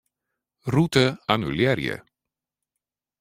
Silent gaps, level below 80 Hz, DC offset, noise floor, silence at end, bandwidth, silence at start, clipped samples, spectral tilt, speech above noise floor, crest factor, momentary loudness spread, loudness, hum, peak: none; -54 dBFS; under 0.1%; -87 dBFS; 1.2 s; 16 kHz; 0.65 s; under 0.1%; -6 dB/octave; 65 dB; 22 dB; 13 LU; -23 LUFS; none; -4 dBFS